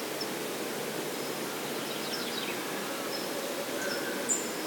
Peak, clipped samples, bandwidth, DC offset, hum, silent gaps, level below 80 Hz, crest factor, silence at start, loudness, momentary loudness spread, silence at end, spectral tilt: -16 dBFS; under 0.1%; 18 kHz; under 0.1%; none; none; -82 dBFS; 18 dB; 0 s; -33 LUFS; 4 LU; 0 s; -2 dB/octave